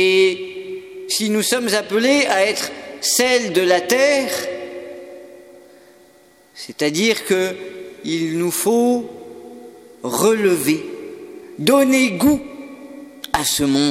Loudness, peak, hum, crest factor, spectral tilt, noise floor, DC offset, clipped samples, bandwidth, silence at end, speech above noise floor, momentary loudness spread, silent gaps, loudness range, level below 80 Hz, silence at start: -17 LUFS; 0 dBFS; none; 20 dB; -3 dB/octave; -51 dBFS; under 0.1%; under 0.1%; 17 kHz; 0 s; 34 dB; 21 LU; none; 6 LU; -54 dBFS; 0 s